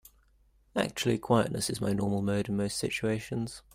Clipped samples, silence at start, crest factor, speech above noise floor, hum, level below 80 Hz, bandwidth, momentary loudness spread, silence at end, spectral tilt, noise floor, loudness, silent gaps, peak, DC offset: under 0.1%; 0.75 s; 20 dB; 35 dB; none; -58 dBFS; 16 kHz; 7 LU; 0.15 s; -5 dB/octave; -65 dBFS; -30 LUFS; none; -12 dBFS; under 0.1%